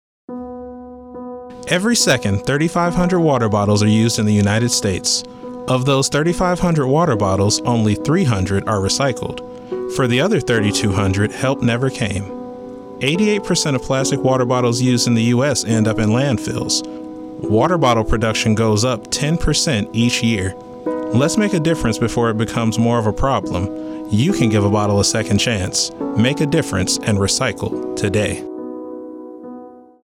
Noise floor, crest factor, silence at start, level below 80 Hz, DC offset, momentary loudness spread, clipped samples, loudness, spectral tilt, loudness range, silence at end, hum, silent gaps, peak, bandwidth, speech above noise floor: -38 dBFS; 14 dB; 0.3 s; -38 dBFS; under 0.1%; 15 LU; under 0.1%; -17 LUFS; -5 dB/octave; 2 LU; 0.25 s; none; none; -4 dBFS; 16 kHz; 21 dB